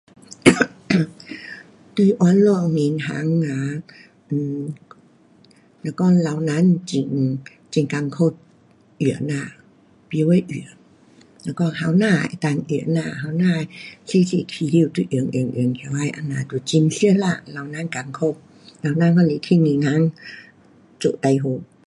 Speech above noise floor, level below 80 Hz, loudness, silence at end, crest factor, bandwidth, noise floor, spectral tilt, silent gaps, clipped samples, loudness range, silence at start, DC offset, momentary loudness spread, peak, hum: 34 dB; -60 dBFS; -20 LUFS; 0.2 s; 20 dB; 11.5 kHz; -53 dBFS; -6.5 dB/octave; none; under 0.1%; 4 LU; 0.45 s; under 0.1%; 15 LU; 0 dBFS; none